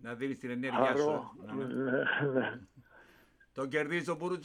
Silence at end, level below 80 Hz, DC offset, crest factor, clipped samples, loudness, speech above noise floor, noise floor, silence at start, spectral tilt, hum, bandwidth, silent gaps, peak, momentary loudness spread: 0 s; -74 dBFS; under 0.1%; 20 dB; under 0.1%; -33 LUFS; 30 dB; -64 dBFS; 0 s; -6 dB/octave; none; 11.5 kHz; none; -14 dBFS; 11 LU